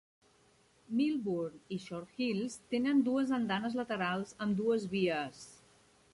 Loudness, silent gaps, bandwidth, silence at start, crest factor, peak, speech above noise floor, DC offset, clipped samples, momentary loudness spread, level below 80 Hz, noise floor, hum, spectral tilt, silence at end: -34 LUFS; none; 11.5 kHz; 0.9 s; 16 dB; -20 dBFS; 34 dB; under 0.1%; under 0.1%; 12 LU; -72 dBFS; -68 dBFS; none; -6 dB/octave; 0.6 s